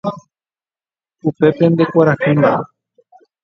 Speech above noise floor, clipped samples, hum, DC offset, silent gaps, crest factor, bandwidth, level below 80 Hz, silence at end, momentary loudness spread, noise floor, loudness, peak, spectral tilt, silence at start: over 77 dB; under 0.1%; none; under 0.1%; none; 16 dB; 6.8 kHz; -56 dBFS; 0.8 s; 11 LU; under -90 dBFS; -14 LUFS; 0 dBFS; -9.5 dB/octave; 0.05 s